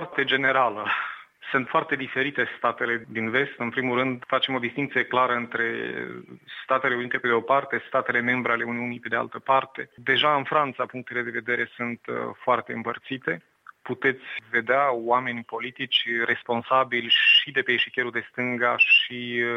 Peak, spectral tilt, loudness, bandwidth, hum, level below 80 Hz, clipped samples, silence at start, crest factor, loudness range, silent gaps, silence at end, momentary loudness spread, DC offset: -8 dBFS; -5.5 dB/octave; -24 LUFS; 7 kHz; none; -74 dBFS; under 0.1%; 0 s; 18 dB; 5 LU; none; 0 s; 11 LU; under 0.1%